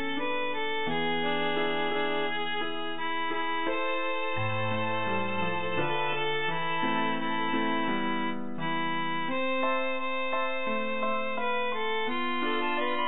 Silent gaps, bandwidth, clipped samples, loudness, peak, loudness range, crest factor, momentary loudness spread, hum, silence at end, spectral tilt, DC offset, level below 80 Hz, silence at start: none; 4.1 kHz; under 0.1%; -30 LUFS; -16 dBFS; 1 LU; 14 dB; 2 LU; none; 0 s; -8 dB/octave; 2%; -68 dBFS; 0 s